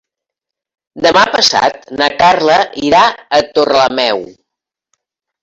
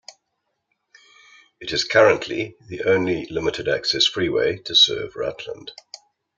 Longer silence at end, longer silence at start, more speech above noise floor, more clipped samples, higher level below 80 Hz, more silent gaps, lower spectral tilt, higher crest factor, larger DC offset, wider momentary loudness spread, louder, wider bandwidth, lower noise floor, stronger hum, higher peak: first, 1.1 s vs 0.4 s; second, 0.95 s vs 1.6 s; first, 71 dB vs 55 dB; neither; first, -48 dBFS vs -56 dBFS; neither; about the same, -2.5 dB/octave vs -3 dB/octave; second, 14 dB vs 20 dB; neither; second, 6 LU vs 19 LU; first, -11 LUFS vs -20 LUFS; first, 16 kHz vs 7.8 kHz; first, -82 dBFS vs -76 dBFS; neither; about the same, 0 dBFS vs -2 dBFS